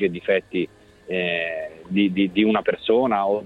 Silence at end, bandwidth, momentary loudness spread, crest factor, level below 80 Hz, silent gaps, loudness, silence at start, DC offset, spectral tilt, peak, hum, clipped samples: 0 s; 5 kHz; 9 LU; 16 dB; -58 dBFS; none; -22 LUFS; 0 s; under 0.1%; -7.5 dB/octave; -6 dBFS; none; under 0.1%